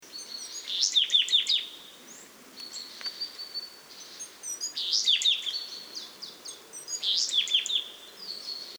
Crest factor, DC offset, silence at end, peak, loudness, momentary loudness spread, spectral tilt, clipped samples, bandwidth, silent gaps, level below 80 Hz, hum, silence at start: 22 dB; under 0.1%; 0 s; -10 dBFS; -26 LUFS; 22 LU; 3 dB/octave; under 0.1%; over 20 kHz; none; -82 dBFS; none; 0 s